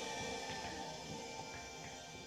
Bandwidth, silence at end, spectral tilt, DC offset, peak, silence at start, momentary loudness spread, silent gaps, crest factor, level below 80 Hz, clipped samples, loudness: 16 kHz; 0 s; -2.5 dB/octave; under 0.1%; -32 dBFS; 0 s; 6 LU; none; 16 dB; -66 dBFS; under 0.1%; -45 LUFS